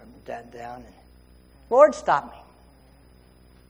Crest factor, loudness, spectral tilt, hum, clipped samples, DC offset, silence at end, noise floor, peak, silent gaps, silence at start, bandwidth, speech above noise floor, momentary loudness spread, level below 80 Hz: 24 dB; -20 LUFS; -5 dB/octave; none; under 0.1%; under 0.1%; 1.4 s; -53 dBFS; -2 dBFS; none; 0.3 s; 10.5 kHz; 31 dB; 24 LU; -56 dBFS